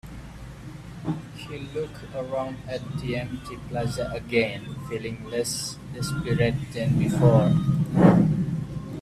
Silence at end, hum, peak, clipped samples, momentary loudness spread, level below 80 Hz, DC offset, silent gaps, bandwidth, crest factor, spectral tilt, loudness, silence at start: 0 s; none; -2 dBFS; under 0.1%; 18 LU; -46 dBFS; under 0.1%; none; 14 kHz; 22 dB; -6.5 dB/octave; -25 LUFS; 0.05 s